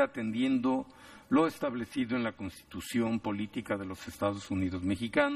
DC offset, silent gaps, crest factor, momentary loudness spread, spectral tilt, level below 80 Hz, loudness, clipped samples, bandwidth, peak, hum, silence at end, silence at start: under 0.1%; none; 20 dB; 13 LU; -6 dB/octave; -62 dBFS; -32 LUFS; under 0.1%; 14.5 kHz; -12 dBFS; none; 0 s; 0 s